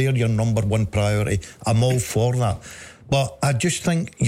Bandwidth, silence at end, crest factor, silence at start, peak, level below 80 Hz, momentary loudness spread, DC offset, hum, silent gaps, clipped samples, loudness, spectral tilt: 16 kHz; 0 s; 12 dB; 0 s; -10 dBFS; -42 dBFS; 5 LU; under 0.1%; none; none; under 0.1%; -21 LUFS; -5.5 dB/octave